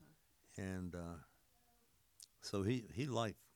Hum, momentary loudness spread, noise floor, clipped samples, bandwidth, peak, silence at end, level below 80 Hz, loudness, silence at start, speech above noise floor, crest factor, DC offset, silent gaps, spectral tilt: none; 17 LU; -75 dBFS; under 0.1%; over 20 kHz; -24 dBFS; 0.2 s; -74 dBFS; -44 LUFS; 0 s; 33 dB; 22 dB; under 0.1%; none; -6 dB/octave